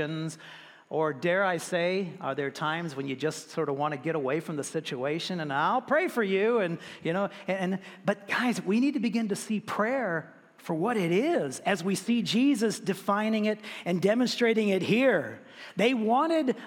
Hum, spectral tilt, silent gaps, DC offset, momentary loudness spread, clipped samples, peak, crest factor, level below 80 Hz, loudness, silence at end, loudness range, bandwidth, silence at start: none; -5 dB/octave; none; under 0.1%; 9 LU; under 0.1%; -10 dBFS; 18 dB; -80 dBFS; -28 LUFS; 0 s; 4 LU; 17 kHz; 0 s